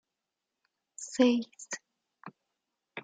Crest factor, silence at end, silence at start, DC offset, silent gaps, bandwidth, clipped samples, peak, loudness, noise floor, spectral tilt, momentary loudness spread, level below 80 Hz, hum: 24 dB; 0.05 s; 1 s; under 0.1%; none; 9.4 kHz; under 0.1%; -12 dBFS; -30 LUFS; -88 dBFS; -3 dB/octave; 26 LU; -82 dBFS; none